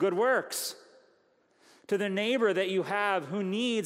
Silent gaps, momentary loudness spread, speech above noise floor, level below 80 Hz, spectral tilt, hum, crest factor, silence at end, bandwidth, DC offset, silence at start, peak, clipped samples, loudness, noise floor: none; 7 LU; 39 dB; -86 dBFS; -4 dB/octave; none; 16 dB; 0 s; 16 kHz; under 0.1%; 0 s; -14 dBFS; under 0.1%; -29 LUFS; -68 dBFS